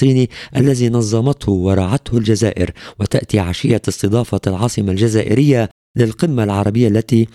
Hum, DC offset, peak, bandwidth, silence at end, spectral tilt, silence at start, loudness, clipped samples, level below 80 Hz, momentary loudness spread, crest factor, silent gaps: none; under 0.1%; 0 dBFS; 13.5 kHz; 0.1 s; -6.5 dB/octave; 0 s; -16 LUFS; under 0.1%; -40 dBFS; 5 LU; 14 dB; 5.71-5.94 s